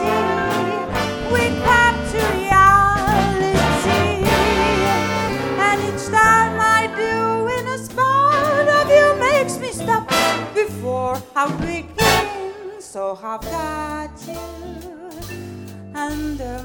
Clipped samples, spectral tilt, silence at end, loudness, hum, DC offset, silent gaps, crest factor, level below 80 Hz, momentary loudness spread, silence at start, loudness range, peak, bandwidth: under 0.1%; -4.5 dB/octave; 0 s; -17 LUFS; none; under 0.1%; none; 18 dB; -36 dBFS; 18 LU; 0 s; 13 LU; 0 dBFS; 18 kHz